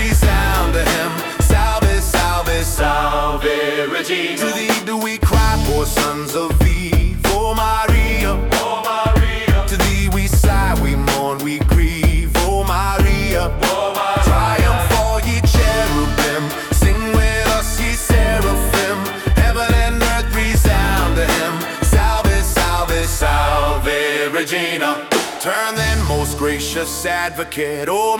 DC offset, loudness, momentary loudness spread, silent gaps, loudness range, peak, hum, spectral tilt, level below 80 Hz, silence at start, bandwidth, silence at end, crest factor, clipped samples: under 0.1%; -17 LUFS; 4 LU; none; 2 LU; -2 dBFS; none; -4.5 dB/octave; -20 dBFS; 0 s; 19 kHz; 0 s; 12 dB; under 0.1%